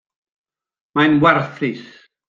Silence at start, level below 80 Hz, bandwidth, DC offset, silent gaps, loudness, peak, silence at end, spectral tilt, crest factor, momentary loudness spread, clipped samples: 0.95 s; -56 dBFS; 7.2 kHz; under 0.1%; none; -16 LUFS; 0 dBFS; 0.45 s; -7.5 dB/octave; 18 dB; 12 LU; under 0.1%